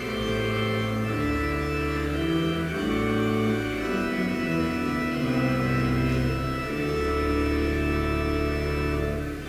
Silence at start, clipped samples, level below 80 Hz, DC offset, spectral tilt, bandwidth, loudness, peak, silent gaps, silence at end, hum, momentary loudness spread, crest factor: 0 s; under 0.1%; -34 dBFS; under 0.1%; -6.5 dB/octave; 16 kHz; -26 LUFS; -14 dBFS; none; 0 s; none; 3 LU; 12 dB